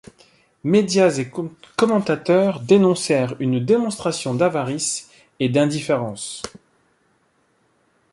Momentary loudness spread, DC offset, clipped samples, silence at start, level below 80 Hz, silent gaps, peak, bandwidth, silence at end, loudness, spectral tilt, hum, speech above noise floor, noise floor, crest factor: 13 LU; under 0.1%; under 0.1%; 0.65 s; -62 dBFS; none; -2 dBFS; 11.5 kHz; 1.65 s; -20 LUFS; -5.5 dB/octave; none; 44 dB; -63 dBFS; 18 dB